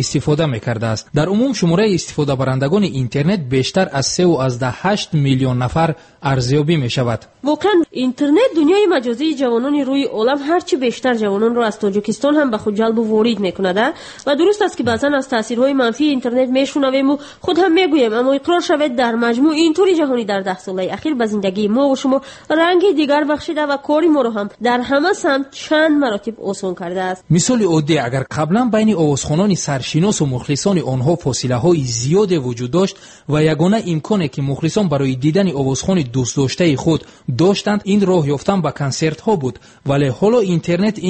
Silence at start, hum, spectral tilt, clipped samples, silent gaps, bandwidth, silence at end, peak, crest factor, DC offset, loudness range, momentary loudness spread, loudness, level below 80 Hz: 0 s; none; -5.5 dB/octave; under 0.1%; none; 8.8 kHz; 0 s; -2 dBFS; 14 dB; under 0.1%; 2 LU; 6 LU; -16 LUFS; -48 dBFS